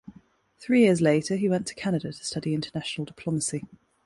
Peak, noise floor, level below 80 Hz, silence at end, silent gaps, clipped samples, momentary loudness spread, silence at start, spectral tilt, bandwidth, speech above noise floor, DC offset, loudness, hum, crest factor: -8 dBFS; -57 dBFS; -62 dBFS; 0.4 s; none; under 0.1%; 13 LU; 0.1 s; -5.5 dB/octave; 11.5 kHz; 31 dB; under 0.1%; -26 LUFS; none; 18 dB